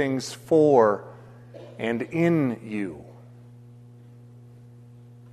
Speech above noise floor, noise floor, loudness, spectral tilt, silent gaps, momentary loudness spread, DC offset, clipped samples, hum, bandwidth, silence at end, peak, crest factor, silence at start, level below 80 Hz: 25 dB; -47 dBFS; -23 LUFS; -6.5 dB/octave; none; 26 LU; under 0.1%; under 0.1%; none; 13.5 kHz; 2.2 s; -6 dBFS; 20 dB; 0 s; -64 dBFS